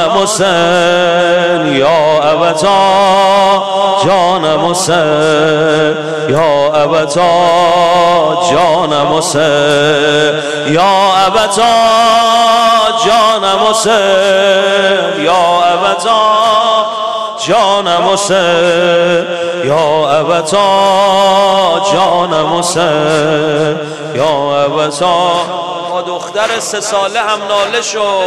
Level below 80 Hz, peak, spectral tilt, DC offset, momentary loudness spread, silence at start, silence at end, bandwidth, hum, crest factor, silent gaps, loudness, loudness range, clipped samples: -48 dBFS; 0 dBFS; -3.5 dB/octave; 0.5%; 6 LU; 0 s; 0 s; 13.5 kHz; none; 10 dB; none; -10 LUFS; 4 LU; under 0.1%